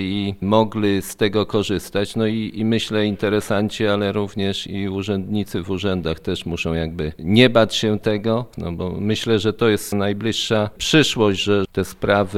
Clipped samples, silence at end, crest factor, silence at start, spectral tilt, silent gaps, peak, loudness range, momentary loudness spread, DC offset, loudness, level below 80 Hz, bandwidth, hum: under 0.1%; 0 s; 20 dB; 0 s; -5.5 dB/octave; none; 0 dBFS; 4 LU; 9 LU; under 0.1%; -20 LUFS; -44 dBFS; 16 kHz; none